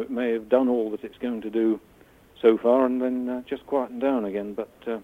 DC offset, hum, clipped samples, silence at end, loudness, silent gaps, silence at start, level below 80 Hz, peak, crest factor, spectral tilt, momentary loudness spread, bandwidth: under 0.1%; none; under 0.1%; 0 s; -25 LUFS; none; 0 s; -62 dBFS; -6 dBFS; 18 dB; -7.5 dB/octave; 11 LU; 4.1 kHz